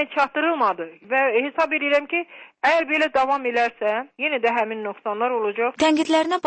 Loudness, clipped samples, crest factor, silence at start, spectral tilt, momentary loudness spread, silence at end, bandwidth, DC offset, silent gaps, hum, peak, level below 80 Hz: -21 LUFS; under 0.1%; 14 dB; 0 s; -3 dB/octave; 7 LU; 0 s; 8.8 kHz; under 0.1%; none; none; -8 dBFS; -64 dBFS